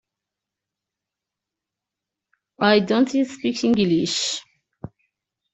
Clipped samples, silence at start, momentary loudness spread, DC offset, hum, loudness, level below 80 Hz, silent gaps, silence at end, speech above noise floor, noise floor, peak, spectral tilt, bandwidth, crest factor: under 0.1%; 2.6 s; 24 LU; under 0.1%; none; -20 LUFS; -62 dBFS; none; 0.65 s; 66 dB; -86 dBFS; -2 dBFS; -4.5 dB/octave; 8.2 kHz; 22 dB